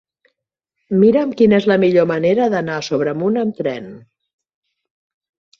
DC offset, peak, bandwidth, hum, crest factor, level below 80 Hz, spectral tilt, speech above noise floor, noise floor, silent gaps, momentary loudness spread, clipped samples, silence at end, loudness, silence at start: under 0.1%; -2 dBFS; 7.2 kHz; none; 16 dB; -58 dBFS; -7 dB/octave; 63 dB; -78 dBFS; none; 10 LU; under 0.1%; 1.6 s; -16 LUFS; 0.9 s